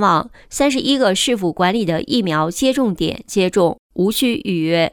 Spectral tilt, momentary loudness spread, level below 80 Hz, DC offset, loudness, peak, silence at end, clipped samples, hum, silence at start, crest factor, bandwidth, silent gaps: -4.5 dB/octave; 4 LU; -46 dBFS; under 0.1%; -17 LUFS; -2 dBFS; 0.05 s; under 0.1%; none; 0 s; 14 dB; over 20 kHz; 3.79-3.90 s